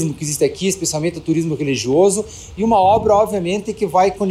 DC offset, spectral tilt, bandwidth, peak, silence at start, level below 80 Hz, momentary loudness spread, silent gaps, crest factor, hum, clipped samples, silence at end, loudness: under 0.1%; -5 dB/octave; 15.5 kHz; -4 dBFS; 0 s; -44 dBFS; 8 LU; none; 14 dB; none; under 0.1%; 0 s; -17 LUFS